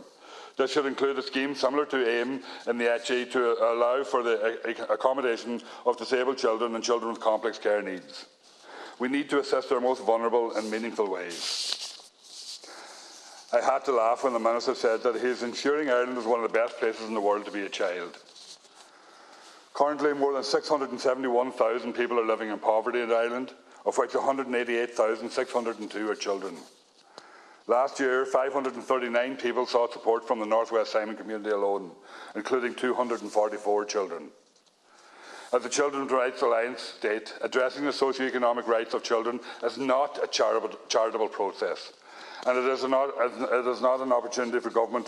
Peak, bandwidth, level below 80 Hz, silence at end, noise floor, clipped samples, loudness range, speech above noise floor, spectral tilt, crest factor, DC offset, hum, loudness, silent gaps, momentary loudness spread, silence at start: -8 dBFS; 12 kHz; -84 dBFS; 0 s; -62 dBFS; under 0.1%; 4 LU; 35 dB; -3 dB/octave; 20 dB; under 0.1%; none; -28 LUFS; none; 13 LU; 0 s